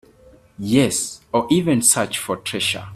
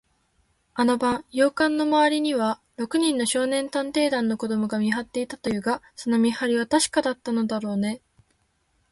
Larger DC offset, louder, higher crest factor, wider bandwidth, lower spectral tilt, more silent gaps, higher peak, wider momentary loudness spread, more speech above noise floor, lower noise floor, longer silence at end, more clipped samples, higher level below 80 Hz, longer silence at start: neither; first, -19 LUFS vs -24 LUFS; about the same, 20 dB vs 16 dB; first, 16 kHz vs 12 kHz; about the same, -3.5 dB/octave vs -4 dB/octave; neither; first, -2 dBFS vs -8 dBFS; about the same, 9 LU vs 7 LU; second, 30 dB vs 45 dB; second, -50 dBFS vs -68 dBFS; second, 0 s vs 0.95 s; neither; first, -52 dBFS vs -62 dBFS; second, 0.6 s vs 0.75 s